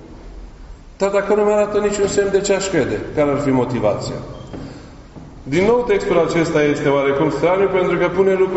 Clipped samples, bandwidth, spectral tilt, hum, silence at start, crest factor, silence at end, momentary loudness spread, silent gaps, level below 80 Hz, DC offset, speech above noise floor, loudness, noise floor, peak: under 0.1%; 8.2 kHz; -5.5 dB/octave; none; 0 s; 16 dB; 0 s; 12 LU; none; -40 dBFS; under 0.1%; 21 dB; -17 LUFS; -37 dBFS; -2 dBFS